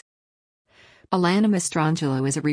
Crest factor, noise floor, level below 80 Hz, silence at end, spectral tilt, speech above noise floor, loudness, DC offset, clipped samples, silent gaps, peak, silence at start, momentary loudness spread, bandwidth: 16 dB; under -90 dBFS; -64 dBFS; 0 s; -5.5 dB/octave; over 69 dB; -22 LUFS; under 0.1%; under 0.1%; none; -8 dBFS; 1.1 s; 4 LU; 10.5 kHz